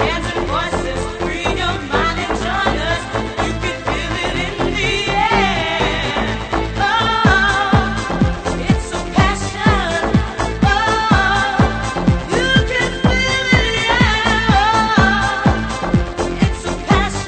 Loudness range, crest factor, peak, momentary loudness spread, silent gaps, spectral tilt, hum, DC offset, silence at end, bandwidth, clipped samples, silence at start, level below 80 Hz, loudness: 5 LU; 16 dB; 0 dBFS; 7 LU; none; -5 dB/octave; none; under 0.1%; 0 s; 9.2 kHz; under 0.1%; 0 s; -26 dBFS; -16 LUFS